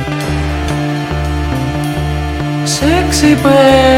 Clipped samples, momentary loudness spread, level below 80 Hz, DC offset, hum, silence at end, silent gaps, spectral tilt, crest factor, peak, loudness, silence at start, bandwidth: 0.4%; 9 LU; -22 dBFS; under 0.1%; none; 0 s; none; -5 dB/octave; 12 dB; 0 dBFS; -13 LUFS; 0 s; 16.5 kHz